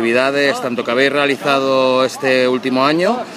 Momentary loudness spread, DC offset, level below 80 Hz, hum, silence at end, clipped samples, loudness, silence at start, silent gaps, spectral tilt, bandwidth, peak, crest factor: 3 LU; under 0.1%; -68 dBFS; none; 0 s; under 0.1%; -15 LUFS; 0 s; none; -4.5 dB/octave; 14.5 kHz; 0 dBFS; 16 dB